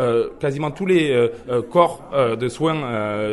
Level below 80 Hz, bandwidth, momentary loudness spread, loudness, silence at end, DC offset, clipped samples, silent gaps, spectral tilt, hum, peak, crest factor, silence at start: -52 dBFS; 11.5 kHz; 7 LU; -20 LUFS; 0 s; under 0.1%; under 0.1%; none; -6.5 dB/octave; none; 0 dBFS; 20 dB; 0 s